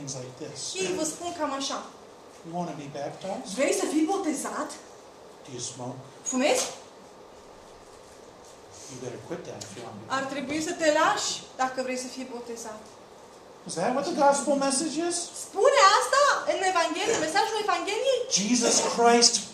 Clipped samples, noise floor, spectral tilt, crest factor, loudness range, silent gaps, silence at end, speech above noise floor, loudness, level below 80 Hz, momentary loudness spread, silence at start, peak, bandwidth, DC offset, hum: under 0.1%; -49 dBFS; -2 dB/octave; 22 dB; 10 LU; none; 0 s; 22 dB; -25 LUFS; -70 dBFS; 18 LU; 0 s; -4 dBFS; 14.5 kHz; under 0.1%; none